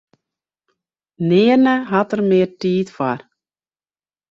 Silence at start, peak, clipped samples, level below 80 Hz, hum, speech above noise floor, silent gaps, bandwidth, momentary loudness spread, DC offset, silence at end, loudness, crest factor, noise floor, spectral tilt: 1.2 s; -2 dBFS; under 0.1%; -62 dBFS; none; over 74 dB; none; 7.6 kHz; 10 LU; under 0.1%; 1.1 s; -17 LUFS; 16 dB; under -90 dBFS; -7.5 dB/octave